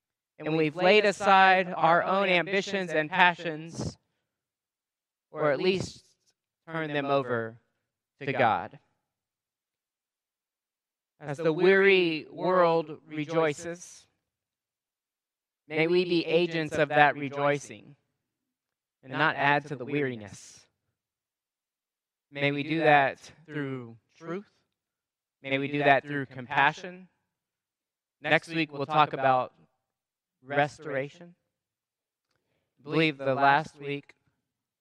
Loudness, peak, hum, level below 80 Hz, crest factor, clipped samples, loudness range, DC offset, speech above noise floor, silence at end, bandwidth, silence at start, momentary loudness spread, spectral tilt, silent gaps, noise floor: -26 LUFS; -2 dBFS; none; -70 dBFS; 26 dB; under 0.1%; 8 LU; under 0.1%; over 64 dB; 0.8 s; 11 kHz; 0.4 s; 17 LU; -5.5 dB/octave; none; under -90 dBFS